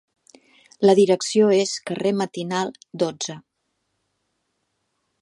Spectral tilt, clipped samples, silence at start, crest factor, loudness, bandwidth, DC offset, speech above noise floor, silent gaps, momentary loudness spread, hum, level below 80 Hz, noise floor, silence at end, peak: -4.5 dB/octave; under 0.1%; 0.8 s; 20 dB; -21 LUFS; 11.5 kHz; under 0.1%; 54 dB; none; 14 LU; none; -72 dBFS; -74 dBFS; 1.8 s; -4 dBFS